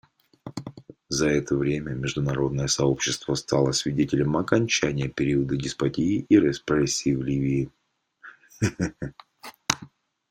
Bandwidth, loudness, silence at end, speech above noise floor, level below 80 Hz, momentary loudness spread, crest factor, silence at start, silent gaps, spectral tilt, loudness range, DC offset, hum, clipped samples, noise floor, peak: 16 kHz; -25 LUFS; 0.45 s; 28 dB; -50 dBFS; 16 LU; 24 dB; 0.45 s; none; -5 dB/octave; 5 LU; under 0.1%; none; under 0.1%; -52 dBFS; -2 dBFS